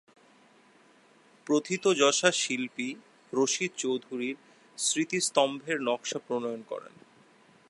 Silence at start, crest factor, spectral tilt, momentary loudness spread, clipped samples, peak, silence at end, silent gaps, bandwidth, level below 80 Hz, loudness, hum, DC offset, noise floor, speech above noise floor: 1.45 s; 24 dB; -2.5 dB/octave; 16 LU; under 0.1%; -6 dBFS; 0.8 s; none; 11.5 kHz; -86 dBFS; -29 LUFS; none; under 0.1%; -60 dBFS; 31 dB